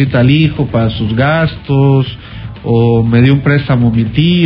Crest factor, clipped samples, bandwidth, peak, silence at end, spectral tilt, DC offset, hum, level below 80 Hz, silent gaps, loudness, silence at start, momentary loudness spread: 10 dB; under 0.1%; 5.4 kHz; 0 dBFS; 0 s; -10.5 dB/octave; under 0.1%; none; -32 dBFS; none; -11 LUFS; 0 s; 6 LU